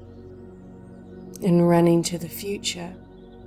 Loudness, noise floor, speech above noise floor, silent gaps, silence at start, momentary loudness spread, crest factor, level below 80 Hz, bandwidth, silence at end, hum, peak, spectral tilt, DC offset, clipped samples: -22 LUFS; -43 dBFS; 22 dB; none; 0 s; 26 LU; 18 dB; -54 dBFS; 16.5 kHz; 0 s; none; -6 dBFS; -6 dB/octave; under 0.1%; under 0.1%